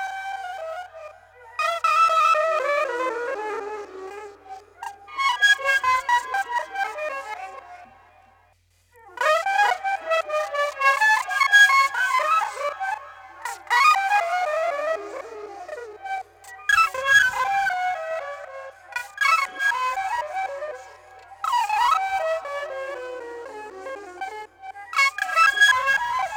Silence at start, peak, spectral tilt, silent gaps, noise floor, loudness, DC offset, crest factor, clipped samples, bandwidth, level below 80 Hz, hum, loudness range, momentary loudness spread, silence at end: 0 s; -6 dBFS; 0.5 dB/octave; none; -61 dBFS; -21 LUFS; under 0.1%; 18 dB; under 0.1%; 18 kHz; -64 dBFS; none; 7 LU; 20 LU; 0 s